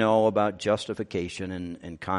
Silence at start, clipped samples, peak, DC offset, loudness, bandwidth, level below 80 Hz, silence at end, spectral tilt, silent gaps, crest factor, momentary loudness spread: 0 s; under 0.1%; -10 dBFS; under 0.1%; -27 LUFS; 11.5 kHz; -58 dBFS; 0 s; -6 dB/octave; none; 18 dB; 14 LU